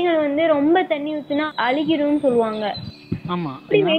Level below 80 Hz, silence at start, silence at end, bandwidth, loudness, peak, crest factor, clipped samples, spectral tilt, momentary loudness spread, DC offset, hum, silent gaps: -58 dBFS; 0 s; 0 s; 9 kHz; -20 LUFS; -4 dBFS; 16 dB; under 0.1%; -7.5 dB/octave; 9 LU; under 0.1%; none; none